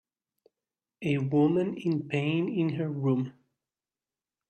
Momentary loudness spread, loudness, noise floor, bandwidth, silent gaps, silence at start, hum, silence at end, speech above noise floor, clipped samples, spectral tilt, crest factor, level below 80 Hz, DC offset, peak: 6 LU; -29 LUFS; under -90 dBFS; 8.6 kHz; none; 1 s; none; 1.2 s; over 63 dB; under 0.1%; -8.5 dB/octave; 16 dB; -72 dBFS; under 0.1%; -14 dBFS